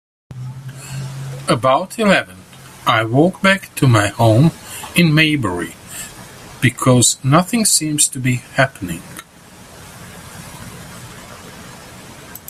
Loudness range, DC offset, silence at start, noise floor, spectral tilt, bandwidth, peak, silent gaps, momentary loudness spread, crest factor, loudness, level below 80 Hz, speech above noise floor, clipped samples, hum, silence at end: 11 LU; under 0.1%; 0.3 s; -42 dBFS; -4 dB/octave; 15 kHz; 0 dBFS; none; 23 LU; 18 dB; -15 LUFS; -48 dBFS; 27 dB; under 0.1%; none; 0.1 s